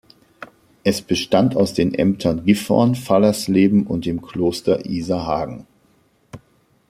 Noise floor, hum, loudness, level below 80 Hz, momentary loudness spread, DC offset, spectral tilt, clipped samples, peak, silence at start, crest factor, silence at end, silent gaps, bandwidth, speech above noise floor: -59 dBFS; none; -19 LUFS; -50 dBFS; 8 LU; under 0.1%; -6 dB/octave; under 0.1%; -2 dBFS; 0.4 s; 18 dB; 0.55 s; none; 15.5 kHz; 41 dB